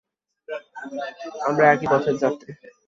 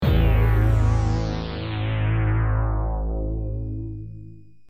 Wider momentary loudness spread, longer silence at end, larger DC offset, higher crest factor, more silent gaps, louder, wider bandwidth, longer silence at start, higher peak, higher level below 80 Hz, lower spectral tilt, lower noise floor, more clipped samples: first, 18 LU vs 13 LU; about the same, 0.35 s vs 0.3 s; second, under 0.1% vs 0.5%; first, 20 dB vs 14 dB; neither; about the same, -21 LUFS vs -23 LUFS; second, 7.6 kHz vs 15 kHz; first, 0.5 s vs 0 s; first, -2 dBFS vs -8 dBFS; second, -64 dBFS vs -26 dBFS; second, -6.5 dB/octave vs -8 dB/octave; about the same, -41 dBFS vs -44 dBFS; neither